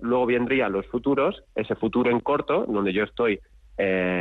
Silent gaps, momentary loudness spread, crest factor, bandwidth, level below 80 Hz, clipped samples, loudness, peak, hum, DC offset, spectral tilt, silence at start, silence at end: none; 6 LU; 12 dB; 4.6 kHz; -52 dBFS; under 0.1%; -24 LUFS; -12 dBFS; none; under 0.1%; -8.5 dB/octave; 0 s; 0 s